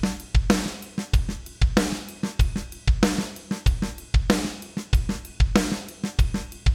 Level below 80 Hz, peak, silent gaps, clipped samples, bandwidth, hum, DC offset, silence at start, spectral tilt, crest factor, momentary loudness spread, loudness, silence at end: -26 dBFS; -2 dBFS; none; under 0.1%; 16 kHz; none; under 0.1%; 0 s; -5.5 dB/octave; 22 dB; 9 LU; -25 LUFS; 0 s